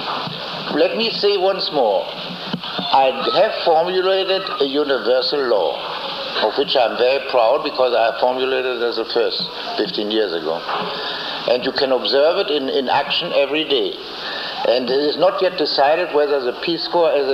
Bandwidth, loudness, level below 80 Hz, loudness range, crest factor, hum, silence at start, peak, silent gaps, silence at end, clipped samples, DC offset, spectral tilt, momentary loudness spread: 14.5 kHz; -18 LUFS; -60 dBFS; 2 LU; 16 dB; none; 0 s; -2 dBFS; none; 0 s; under 0.1%; under 0.1%; -5 dB/octave; 8 LU